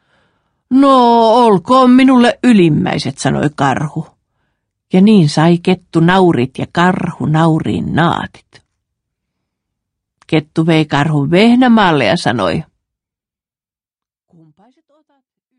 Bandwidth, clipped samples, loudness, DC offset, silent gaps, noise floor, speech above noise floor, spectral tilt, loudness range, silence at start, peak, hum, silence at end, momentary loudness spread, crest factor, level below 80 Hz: 10.5 kHz; under 0.1%; -11 LUFS; under 0.1%; none; under -90 dBFS; over 79 dB; -6.5 dB/octave; 8 LU; 0.7 s; 0 dBFS; none; 2.95 s; 9 LU; 12 dB; -48 dBFS